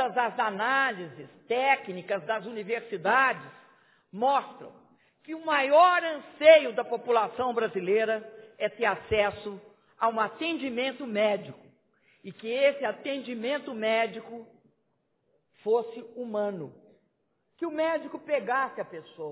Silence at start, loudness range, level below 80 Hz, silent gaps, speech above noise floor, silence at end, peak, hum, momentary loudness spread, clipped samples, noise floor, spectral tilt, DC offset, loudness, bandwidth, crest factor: 0 s; 9 LU; -64 dBFS; none; 48 dB; 0 s; -4 dBFS; none; 18 LU; under 0.1%; -75 dBFS; -8 dB/octave; under 0.1%; -27 LUFS; 4 kHz; 24 dB